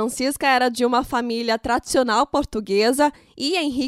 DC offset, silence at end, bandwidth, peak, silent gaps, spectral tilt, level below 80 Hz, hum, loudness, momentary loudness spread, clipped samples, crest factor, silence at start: under 0.1%; 0 s; 16 kHz; -4 dBFS; none; -3 dB/octave; -48 dBFS; none; -20 LUFS; 5 LU; under 0.1%; 16 dB; 0 s